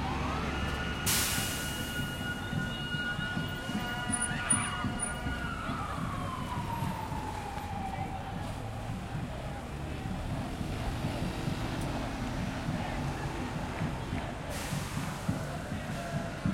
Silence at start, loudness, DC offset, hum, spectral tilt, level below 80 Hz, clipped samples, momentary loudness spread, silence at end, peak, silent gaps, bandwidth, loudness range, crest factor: 0 s; -34 LUFS; under 0.1%; none; -4 dB/octave; -44 dBFS; under 0.1%; 8 LU; 0 s; -16 dBFS; none; 16.5 kHz; 5 LU; 20 dB